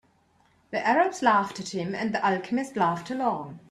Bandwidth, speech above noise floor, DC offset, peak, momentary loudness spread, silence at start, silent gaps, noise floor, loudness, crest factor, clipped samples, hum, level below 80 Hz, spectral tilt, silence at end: 13 kHz; 38 dB; under 0.1%; -6 dBFS; 9 LU; 0.7 s; none; -64 dBFS; -26 LUFS; 20 dB; under 0.1%; none; -68 dBFS; -5 dB/octave; 0.1 s